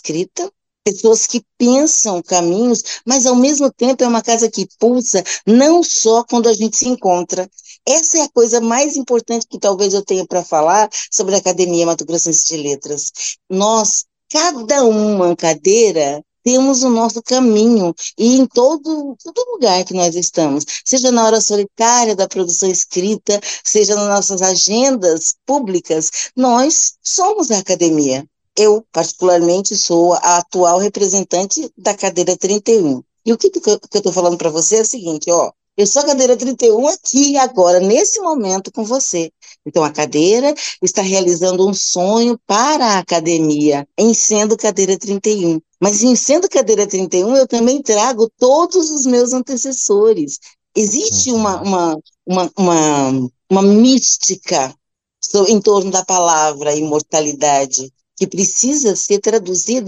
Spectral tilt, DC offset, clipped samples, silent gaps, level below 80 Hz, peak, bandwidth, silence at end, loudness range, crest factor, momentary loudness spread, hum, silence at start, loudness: -3 dB/octave; under 0.1%; under 0.1%; none; -64 dBFS; -2 dBFS; 9.4 kHz; 0 s; 2 LU; 12 dB; 7 LU; none; 0.05 s; -14 LUFS